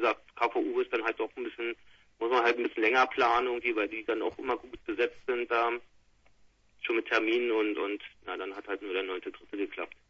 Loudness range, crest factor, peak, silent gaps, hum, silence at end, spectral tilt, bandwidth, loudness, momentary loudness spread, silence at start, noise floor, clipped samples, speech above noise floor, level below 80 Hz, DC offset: 4 LU; 20 dB; -12 dBFS; none; none; 0.2 s; -4 dB/octave; 7.2 kHz; -31 LUFS; 12 LU; 0 s; -63 dBFS; under 0.1%; 32 dB; -66 dBFS; under 0.1%